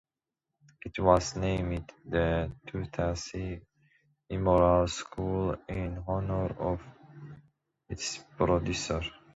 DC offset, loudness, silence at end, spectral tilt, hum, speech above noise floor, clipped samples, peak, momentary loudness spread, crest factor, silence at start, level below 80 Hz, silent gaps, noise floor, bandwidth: under 0.1%; -31 LUFS; 0.2 s; -5.5 dB/octave; none; 59 dB; under 0.1%; -8 dBFS; 15 LU; 22 dB; 0.85 s; -44 dBFS; none; -89 dBFS; 8 kHz